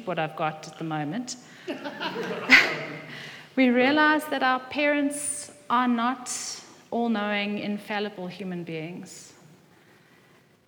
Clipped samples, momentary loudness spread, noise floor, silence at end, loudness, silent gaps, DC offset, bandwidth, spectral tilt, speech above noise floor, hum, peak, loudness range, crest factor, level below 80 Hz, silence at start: under 0.1%; 18 LU; -58 dBFS; 1.35 s; -25 LUFS; none; under 0.1%; 18.5 kHz; -3.5 dB/octave; 32 dB; none; -2 dBFS; 9 LU; 26 dB; -74 dBFS; 0 s